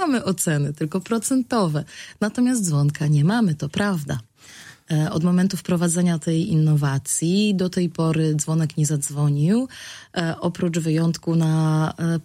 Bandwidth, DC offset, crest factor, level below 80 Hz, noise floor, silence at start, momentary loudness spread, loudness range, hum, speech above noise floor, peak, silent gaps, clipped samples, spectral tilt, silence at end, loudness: 15.5 kHz; under 0.1%; 18 dB; -56 dBFS; -45 dBFS; 0 s; 7 LU; 2 LU; none; 24 dB; -4 dBFS; none; under 0.1%; -6 dB/octave; 0.05 s; -21 LUFS